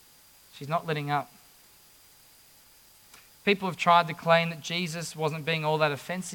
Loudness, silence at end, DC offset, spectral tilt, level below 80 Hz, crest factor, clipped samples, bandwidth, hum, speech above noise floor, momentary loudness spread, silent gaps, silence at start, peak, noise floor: -27 LUFS; 0 s; under 0.1%; -4.5 dB/octave; -72 dBFS; 22 dB; under 0.1%; 18 kHz; none; 30 dB; 10 LU; none; 0.55 s; -8 dBFS; -57 dBFS